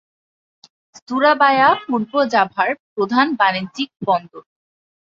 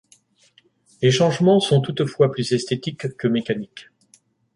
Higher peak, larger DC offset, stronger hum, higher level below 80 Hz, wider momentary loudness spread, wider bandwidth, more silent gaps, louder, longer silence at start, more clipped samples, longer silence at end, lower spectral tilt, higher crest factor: about the same, -2 dBFS vs -4 dBFS; neither; neither; second, -66 dBFS vs -60 dBFS; about the same, 10 LU vs 11 LU; second, 7.6 kHz vs 11.5 kHz; first, 2.80-2.96 s vs none; first, -17 LUFS vs -20 LUFS; about the same, 1.1 s vs 1 s; neither; about the same, 0.65 s vs 0.75 s; about the same, -5 dB/octave vs -6 dB/octave; about the same, 18 dB vs 18 dB